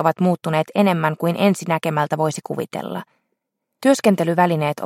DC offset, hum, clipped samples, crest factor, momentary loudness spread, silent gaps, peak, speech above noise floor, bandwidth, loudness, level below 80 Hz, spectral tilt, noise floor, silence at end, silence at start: under 0.1%; none; under 0.1%; 18 dB; 10 LU; none; -2 dBFS; 57 dB; 16 kHz; -19 LUFS; -68 dBFS; -6 dB/octave; -76 dBFS; 0 s; 0 s